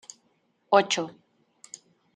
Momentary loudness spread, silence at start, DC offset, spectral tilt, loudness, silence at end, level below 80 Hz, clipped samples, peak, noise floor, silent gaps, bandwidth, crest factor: 24 LU; 0.7 s; under 0.1%; -2.5 dB/octave; -24 LUFS; 1.05 s; -82 dBFS; under 0.1%; -4 dBFS; -70 dBFS; none; 10.5 kHz; 24 dB